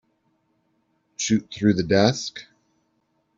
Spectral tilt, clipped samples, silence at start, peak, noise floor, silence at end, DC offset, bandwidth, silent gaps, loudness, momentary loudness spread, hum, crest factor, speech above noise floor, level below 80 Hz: -5 dB/octave; under 0.1%; 1.2 s; -4 dBFS; -70 dBFS; 0.95 s; under 0.1%; 7.8 kHz; none; -22 LUFS; 18 LU; none; 22 dB; 49 dB; -58 dBFS